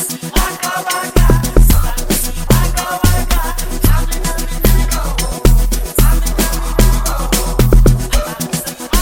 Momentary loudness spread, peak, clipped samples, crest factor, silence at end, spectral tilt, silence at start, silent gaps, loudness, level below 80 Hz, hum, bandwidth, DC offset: 7 LU; 0 dBFS; under 0.1%; 12 dB; 0 s; -4.5 dB/octave; 0 s; none; -15 LUFS; -14 dBFS; none; 17 kHz; under 0.1%